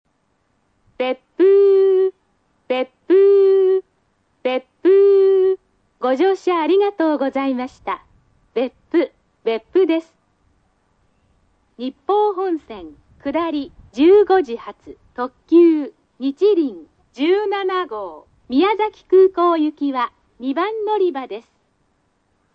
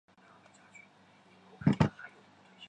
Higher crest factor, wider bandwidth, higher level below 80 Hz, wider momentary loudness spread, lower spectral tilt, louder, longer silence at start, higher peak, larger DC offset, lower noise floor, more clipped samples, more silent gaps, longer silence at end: second, 14 dB vs 24 dB; second, 5.8 kHz vs 9.2 kHz; about the same, -60 dBFS vs -58 dBFS; second, 15 LU vs 27 LU; second, -5.5 dB/octave vs -8 dB/octave; first, -17 LUFS vs -31 LUFS; second, 1 s vs 1.6 s; first, -4 dBFS vs -12 dBFS; neither; first, -66 dBFS vs -62 dBFS; neither; neither; first, 1.15 s vs 0.05 s